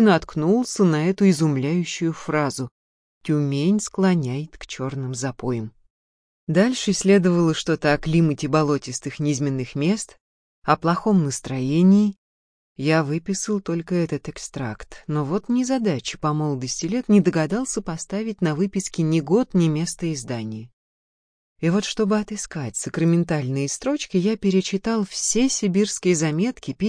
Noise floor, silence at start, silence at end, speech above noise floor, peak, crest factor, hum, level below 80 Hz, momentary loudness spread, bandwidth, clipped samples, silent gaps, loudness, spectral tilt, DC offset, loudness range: under -90 dBFS; 0 s; 0 s; over 69 dB; -4 dBFS; 18 dB; none; -52 dBFS; 11 LU; 10.5 kHz; under 0.1%; 2.71-3.21 s, 5.90-6.47 s, 10.20-10.62 s, 12.18-12.76 s, 20.73-21.56 s; -22 LUFS; -5.5 dB/octave; under 0.1%; 4 LU